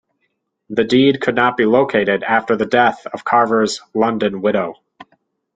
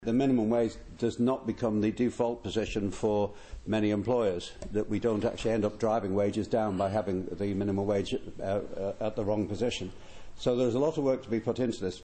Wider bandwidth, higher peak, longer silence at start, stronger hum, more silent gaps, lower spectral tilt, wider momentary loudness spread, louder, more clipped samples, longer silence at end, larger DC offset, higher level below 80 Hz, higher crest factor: about the same, 9.4 kHz vs 8.8 kHz; first, 0 dBFS vs -14 dBFS; first, 0.7 s vs 0 s; neither; neither; second, -5 dB/octave vs -6.5 dB/octave; about the same, 7 LU vs 6 LU; first, -16 LUFS vs -30 LUFS; neither; first, 0.55 s vs 0 s; neither; second, -58 dBFS vs -52 dBFS; about the same, 16 dB vs 14 dB